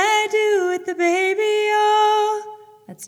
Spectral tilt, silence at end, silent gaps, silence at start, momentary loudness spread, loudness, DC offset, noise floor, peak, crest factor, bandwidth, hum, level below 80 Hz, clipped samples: -1.5 dB/octave; 0 s; none; 0 s; 7 LU; -18 LUFS; under 0.1%; -41 dBFS; -6 dBFS; 14 dB; 18 kHz; none; -80 dBFS; under 0.1%